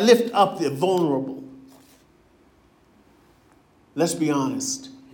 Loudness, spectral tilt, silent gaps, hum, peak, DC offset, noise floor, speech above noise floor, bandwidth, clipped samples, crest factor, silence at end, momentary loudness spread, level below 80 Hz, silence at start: -22 LUFS; -4.5 dB/octave; none; none; -2 dBFS; under 0.1%; -57 dBFS; 36 dB; 18 kHz; under 0.1%; 22 dB; 0.15 s; 17 LU; -68 dBFS; 0 s